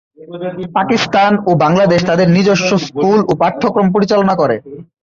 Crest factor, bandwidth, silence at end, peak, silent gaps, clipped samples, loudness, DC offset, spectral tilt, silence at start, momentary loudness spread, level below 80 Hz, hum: 12 dB; 7.4 kHz; 0.2 s; -2 dBFS; none; under 0.1%; -12 LUFS; under 0.1%; -6 dB/octave; 0.2 s; 9 LU; -48 dBFS; none